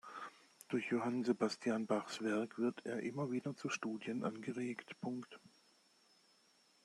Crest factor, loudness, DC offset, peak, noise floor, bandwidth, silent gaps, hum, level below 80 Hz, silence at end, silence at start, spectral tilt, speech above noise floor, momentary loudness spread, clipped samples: 20 dB; -41 LUFS; under 0.1%; -22 dBFS; -72 dBFS; 12.5 kHz; none; none; -86 dBFS; 1.35 s; 0.05 s; -5.5 dB/octave; 32 dB; 13 LU; under 0.1%